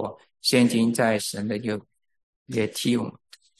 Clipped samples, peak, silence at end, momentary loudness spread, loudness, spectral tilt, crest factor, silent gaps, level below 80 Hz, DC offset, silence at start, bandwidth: under 0.1%; -6 dBFS; 0.5 s; 13 LU; -24 LUFS; -4.5 dB/octave; 20 dB; 2.23-2.46 s; -64 dBFS; under 0.1%; 0 s; 12.5 kHz